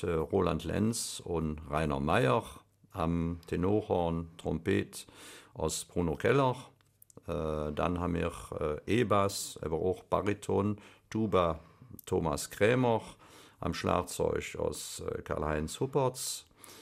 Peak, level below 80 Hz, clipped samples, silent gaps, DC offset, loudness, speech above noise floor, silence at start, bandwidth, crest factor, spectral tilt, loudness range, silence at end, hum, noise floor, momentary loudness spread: -12 dBFS; -50 dBFS; under 0.1%; none; under 0.1%; -32 LUFS; 27 dB; 0 s; 15.5 kHz; 20 dB; -5.5 dB/octave; 2 LU; 0 s; none; -59 dBFS; 12 LU